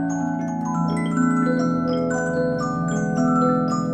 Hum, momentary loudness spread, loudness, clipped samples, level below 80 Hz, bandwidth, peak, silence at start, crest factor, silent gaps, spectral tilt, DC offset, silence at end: none; 5 LU; -22 LUFS; under 0.1%; -54 dBFS; 9 kHz; -8 dBFS; 0 s; 12 dB; none; -7 dB/octave; under 0.1%; 0 s